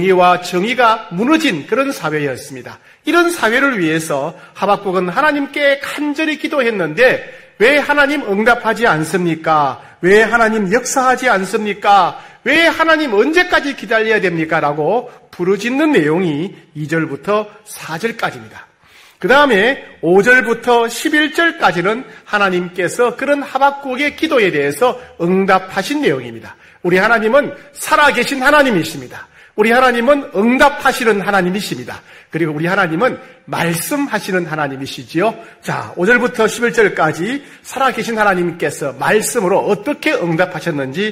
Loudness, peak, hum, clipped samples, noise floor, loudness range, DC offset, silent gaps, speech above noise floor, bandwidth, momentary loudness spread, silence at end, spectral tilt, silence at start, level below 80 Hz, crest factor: -14 LUFS; 0 dBFS; none; under 0.1%; -46 dBFS; 4 LU; under 0.1%; none; 31 dB; 16 kHz; 11 LU; 0 s; -4.5 dB/octave; 0 s; -50 dBFS; 14 dB